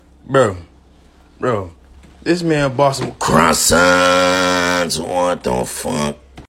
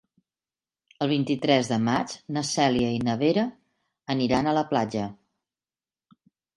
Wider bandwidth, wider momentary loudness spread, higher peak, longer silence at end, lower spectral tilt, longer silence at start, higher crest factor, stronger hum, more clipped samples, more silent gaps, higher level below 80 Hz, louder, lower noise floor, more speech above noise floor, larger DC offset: first, 16.5 kHz vs 11.5 kHz; first, 12 LU vs 8 LU; first, 0 dBFS vs -6 dBFS; second, 0.05 s vs 1.4 s; second, -3.5 dB/octave vs -5 dB/octave; second, 0.3 s vs 1 s; about the same, 16 dB vs 20 dB; neither; neither; neither; first, -40 dBFS vs -58 dBFS; first, -15 LUFS vs -25 LUFS; second, -47 dBFS vs under -90 dBFS; second, 32 dB vs over 66 dB; neither